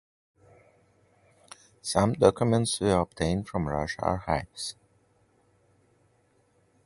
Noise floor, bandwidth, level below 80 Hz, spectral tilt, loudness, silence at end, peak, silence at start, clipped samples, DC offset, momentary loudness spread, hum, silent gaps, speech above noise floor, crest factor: -67 dBFS; 12 kHz; -48 dBFS; -5.5 dB/octave; -27 LUFS; 2.15 s; -4 dBFS; 1.85 s; under 0.1%; under 0.1%; 13 LU; none; none; 41 dB; 26 dB